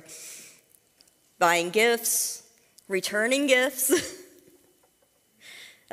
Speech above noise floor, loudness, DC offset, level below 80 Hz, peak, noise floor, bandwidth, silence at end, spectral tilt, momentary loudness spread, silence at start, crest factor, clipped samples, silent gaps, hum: 42 dB; -24 LUFS; under 0.1%; -72 dBFS; -6 dBFS; -66 dBFS; 16 kHz; 0.25 s; -1.5 dB/octave; 23 LU; 0.1 s; 22 dB; under 0.1%; none; none